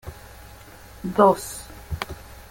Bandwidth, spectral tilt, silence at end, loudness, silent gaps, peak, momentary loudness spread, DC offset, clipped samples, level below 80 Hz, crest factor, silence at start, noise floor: 17 kHz; -5.5 dB/octave; 0.15 s; -22 LUFS; none; -2 dBFS; 26 LU; under 0.1%; under 0.1%; -44 dBFS; 24 dB; 0.05 s; -44 dBFS